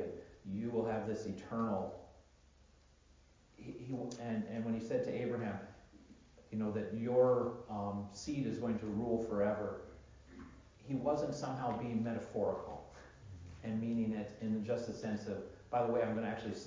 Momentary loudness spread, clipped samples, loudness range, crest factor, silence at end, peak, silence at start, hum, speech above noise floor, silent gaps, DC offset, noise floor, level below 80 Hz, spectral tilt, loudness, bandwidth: 19 LU; under 0.1%; 6 LU; 20 dB; 0 s; -20 dBFS; 0 s; none; 28 dB; none; under 0.1%; -66 dBFS; -64 dBFS; -7 dB/octave; -39 LUFS; 7.6 kHz